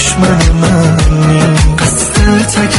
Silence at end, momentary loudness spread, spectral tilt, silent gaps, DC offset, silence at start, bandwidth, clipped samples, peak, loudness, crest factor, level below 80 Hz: 0 s; 1 LU; -5 dB/octave; none; under 0.1%; 0 s; 12 kHz; under 0.1%; 0 dBFS; -9 LUFS; 8 dB; -14 dBFS